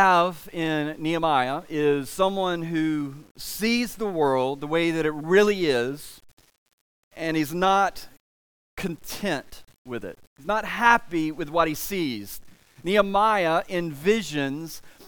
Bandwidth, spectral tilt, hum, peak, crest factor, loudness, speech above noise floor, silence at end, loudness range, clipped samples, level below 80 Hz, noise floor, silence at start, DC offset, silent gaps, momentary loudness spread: 19.5 kHz; -5 dB/octave; none; -2 dBFS; 22 dB; -24 LUFS; over 66 dB; 0 s; 4 LU; under 0.1%; -52 dBFS; under -90 dBFS; 0 s; under 0.1%; 3.31-3.35 s, 6.33-6.37 s, 6.58-6.66 s, 6.73-7.11 s, 8.20-8.77 s, 9.78-9.85 s, 10.27-10.36 s; 16 LU